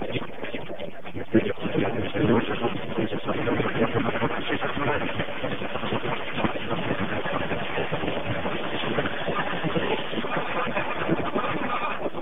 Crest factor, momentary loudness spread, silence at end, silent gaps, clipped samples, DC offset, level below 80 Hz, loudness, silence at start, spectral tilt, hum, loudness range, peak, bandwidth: 20 dB; 5 LU; 0 s; none; under 0.1%; 3%; -50 dBFS; -27 LUFS; 0 s; -8 dB/octave; none; 2 LU; -6 dBFS; 4.5 kHz